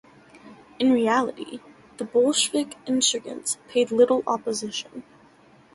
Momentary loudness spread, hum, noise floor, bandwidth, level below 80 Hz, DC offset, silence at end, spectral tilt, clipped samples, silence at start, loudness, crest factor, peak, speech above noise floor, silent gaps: 17 LU; none; -54 dBFS; 11.5 kHz; -68 dBFS; under 0.1%; 0.75 s; -2.5 dB/octave; under 0.1%; 0.45 s; -23 LUFS; 18 dB; -6 dBFS; 31 dB; none